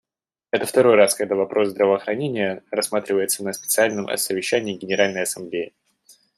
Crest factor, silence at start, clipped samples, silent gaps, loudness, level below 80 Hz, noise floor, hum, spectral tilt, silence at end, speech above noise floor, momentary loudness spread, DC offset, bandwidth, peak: 20 dB; 0.55 s; under 0.1%; none; -21 LUFS; -70 dBFS; -88 dBFS; none; -3 dB/octave; 0.7 s; 67 dB; 9 LU; under 0.1%; 15.5 kHz; -2 dBFS